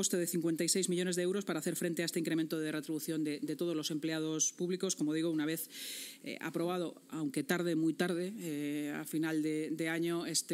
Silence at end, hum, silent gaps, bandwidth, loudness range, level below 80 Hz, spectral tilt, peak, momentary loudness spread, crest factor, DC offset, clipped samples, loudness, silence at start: 0 s; none; none; 16 kHz; 2 LU; under -90 dBFS; -4 dB/octave; -16 dBFS; 7 LU; 18 dB; under 0.1%; under 0.1%; -35 LUFS; 0 s